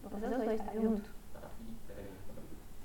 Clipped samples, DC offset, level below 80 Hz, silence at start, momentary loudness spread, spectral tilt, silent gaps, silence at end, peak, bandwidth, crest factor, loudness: under 0.1%; under 0.1%; -52 dBFS; 0 s; 17 LU; -7 dB/octave; none; 0 s; -20 dBFS; 17.5 kHz; 18 dB; -37 LUFS